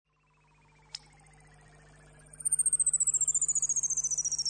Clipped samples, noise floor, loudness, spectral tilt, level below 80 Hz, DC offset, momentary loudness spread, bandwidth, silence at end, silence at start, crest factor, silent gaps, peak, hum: under 0.1%; -68 dBFS; -26 LUFS; 1.5 dB/octave; -64 dBFS; under 0.1%; 21 LU; 9.6 kHz; 0 s; 0.95 s; 16 dB; none; -18 dBFS; 50 Hz at -60 dBFS